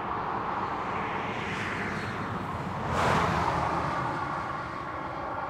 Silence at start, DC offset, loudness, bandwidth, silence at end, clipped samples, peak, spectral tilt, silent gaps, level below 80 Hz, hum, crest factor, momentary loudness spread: 0 s; under 0.1%; -30 LUFS; 16 kHz; 0 s; under 0.1%; -14 dBFS; -5.5 dB/octave; none; -50 dBFS; none; 16 dB; 8 LU